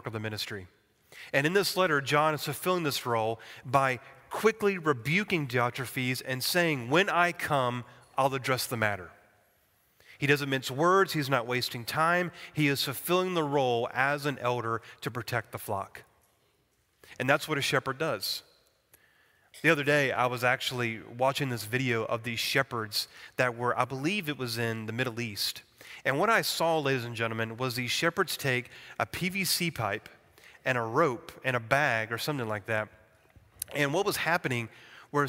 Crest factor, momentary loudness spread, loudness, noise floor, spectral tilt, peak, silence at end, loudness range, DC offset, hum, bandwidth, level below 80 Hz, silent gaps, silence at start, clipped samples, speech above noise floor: 24 dB; 9 LU; -29 LUFS; -71 dBFS; -4 dB/octave; -6 dBFS; 0 s; 4 LU; under 0.1%; none; 16 kHz; -68 dBFS; none; 0.05 s; under 0.1%; 42 dB